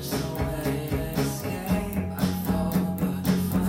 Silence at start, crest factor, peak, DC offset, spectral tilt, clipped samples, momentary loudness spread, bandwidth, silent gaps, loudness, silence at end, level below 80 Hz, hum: 0 s; 16 dB; -10 dBFS; under 0.1%; -6.5 dB/octave; under 0.1%; 4 LU; 17 kHz; none; -27 LUFS; 0 s; -40 dBFS; none